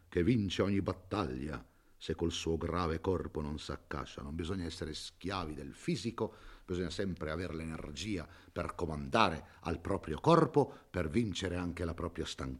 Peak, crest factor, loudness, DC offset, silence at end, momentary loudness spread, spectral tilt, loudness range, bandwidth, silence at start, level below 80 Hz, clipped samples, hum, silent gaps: -8 dBFS; 26 dB; -36 LUFS; under 0.1%; 0 s; 12 LU; -6 dB/octave; 7 LU; 13 kHz; 0.1 s; -54 dBFS; under 0.1%; none; none